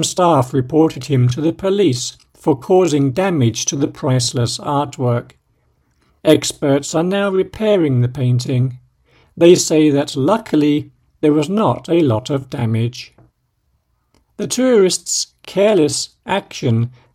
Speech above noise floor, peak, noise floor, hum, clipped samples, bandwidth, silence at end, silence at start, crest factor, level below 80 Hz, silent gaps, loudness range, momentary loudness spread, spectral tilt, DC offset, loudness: 49 dB; 0 dBFS; -64 dBFS; none; under 0.1%; 15.5 kHz; 0.25 s; 0 s; 16 dB; -52 dBFS; none; 4 LU; 8 LU; -5.5 dB/octave; under 0.1%; -16 LUFS